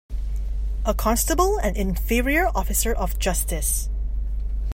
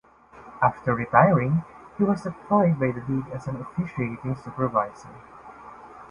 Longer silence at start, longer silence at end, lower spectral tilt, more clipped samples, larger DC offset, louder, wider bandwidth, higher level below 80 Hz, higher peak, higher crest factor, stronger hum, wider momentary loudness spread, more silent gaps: second, 0.1 s vs 0.35 s; about the same, 0 s vs 0.05 s; second, -4 dB/octave vs -9.5 dB/octave; neither; neither; about the same, -24 LUFS vs -24 LUFS; first, 16.5 kHz vs 10 kHz; first, -24 dBFS vs -56 dBFS; second, -6 dBFS vs -2 dBFS; second, 16 dB vs 22 dB; neither; second, 9 LU vs 25 LU; neither